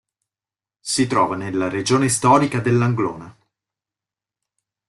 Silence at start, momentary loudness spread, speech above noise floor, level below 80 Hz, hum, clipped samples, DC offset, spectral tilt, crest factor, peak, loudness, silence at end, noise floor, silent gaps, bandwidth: 0.85 s; 9 LU; over 72 dB; -56 dBFS; none; under 0.1%; under 0.1%; -5 dB/octave; 18 dB; -2 dBFS; -19 LUFS; 1.6 s; under -90 dBFS; none; 12.5 kHz